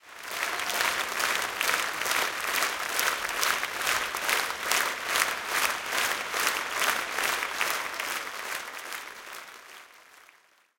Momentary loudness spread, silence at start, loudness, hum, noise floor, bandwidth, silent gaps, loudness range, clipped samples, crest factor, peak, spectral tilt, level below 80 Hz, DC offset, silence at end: 11 LU; 0.05 s; -27 LUFS; none; -61 dBFS; 17 kHz; none; 5 LU; under 0.1%; 28 dB; -2 dBFS; 1 dB/octave; -66 dBFS; under 0.1%; 0.65 s